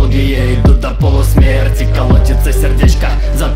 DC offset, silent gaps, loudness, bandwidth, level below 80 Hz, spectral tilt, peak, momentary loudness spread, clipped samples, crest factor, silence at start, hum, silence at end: under 0.1%; none; -11 LUFS; 16 kHz; -10 dBFS; -6.5 dB/octave; 0 dBFS; 3 LU; under 0.1%; 8 dB; 0 s; none; 0 s